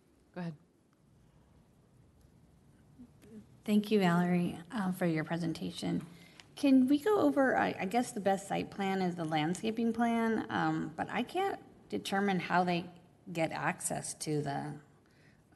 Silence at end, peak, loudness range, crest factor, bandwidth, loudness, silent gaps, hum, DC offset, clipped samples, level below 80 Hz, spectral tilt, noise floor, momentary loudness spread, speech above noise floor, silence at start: 0.75 s; -14 dBFS; 5 LU; 20 dB; 12 kHz; -33 LUFS; none; none; under 0.1%; under 0.1%; -70 dBFS; -5.5 dB/octave; -67 dBFS; 15 LU; 35 dB; 0.35 s